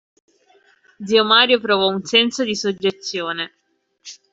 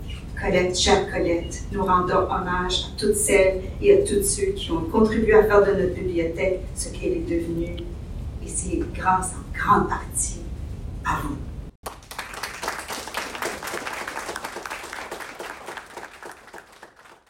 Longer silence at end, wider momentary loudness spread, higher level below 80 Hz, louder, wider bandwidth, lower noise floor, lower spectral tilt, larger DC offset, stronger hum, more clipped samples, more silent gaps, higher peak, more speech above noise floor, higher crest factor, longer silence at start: about the same, 0.2 s vs 0.15 s; about the same, 18 LU vs 17 LU; second, -66 dBFS vs -36 dBFS; first, -17 LUFS vs -23 LUFS; second, 8 kHz vs 16.5 kHz; first, -56 dBFS vs -48 dBFS; about the same, -3 dB/octave vs -4 dB/octave; neither; neither; neither; second, none vs 11.75-11.83 s; about the same, -2 dBFS vs -2 dBFS; first, 38 dB vs 27 dB; about the same, 18 dB vs 20 dB; first, 1 s vs 0 s